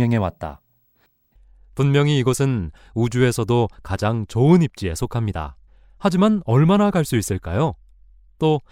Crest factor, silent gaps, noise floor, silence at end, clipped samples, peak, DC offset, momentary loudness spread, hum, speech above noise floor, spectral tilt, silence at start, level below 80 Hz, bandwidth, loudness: 18 dB; none; -63 dBFS; 0.1 s; under 0.1%; -2 dBFS; under 0.1%; 11 LU; none; 44 dB; -6.5 dB/octave; 0 s; -42 dBFS; 16 kHz; -20 LUFS